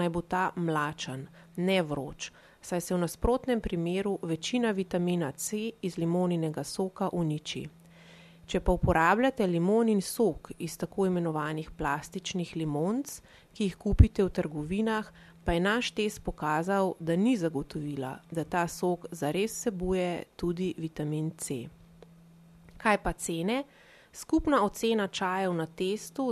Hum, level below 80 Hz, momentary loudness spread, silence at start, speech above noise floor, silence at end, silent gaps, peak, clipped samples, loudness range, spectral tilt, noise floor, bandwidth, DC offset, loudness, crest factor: none; -42 dBFS; 11 LU; 0 s; 26 dB; 0 s; none; -6 dBFS; under 0.1%; 5 LU; -5.5 dB/octave; -55 dBFS; 14 kHz; under 0.1%; -30 LUFS; 24 dB